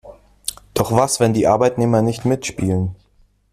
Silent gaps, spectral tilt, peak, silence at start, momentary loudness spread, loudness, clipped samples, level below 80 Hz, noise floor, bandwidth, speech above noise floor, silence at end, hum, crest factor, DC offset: none; -5.5 dB/octave; -2 dBFS; 0.05 s; 12 LU; -18 LUFS; under 0.1%; -46 dBFS; -56 dBFS; 15 kHz; 39 dB; 0.6 s; none; 16 dB; under 0.1%